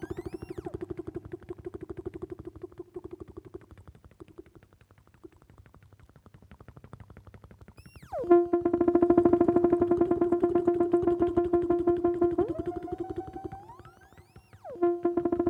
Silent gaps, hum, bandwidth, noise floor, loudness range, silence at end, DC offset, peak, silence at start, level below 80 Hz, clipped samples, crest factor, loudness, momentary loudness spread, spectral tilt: none; none; 3.4 kHz; -60 dBFS; 20 LU; 0 s; under 0.1%; -8 dBFS; 0 s; -54 dBFS; under 0.1%; 20 dB; -27 LUFS; 22 LU; -9.5 dB/octave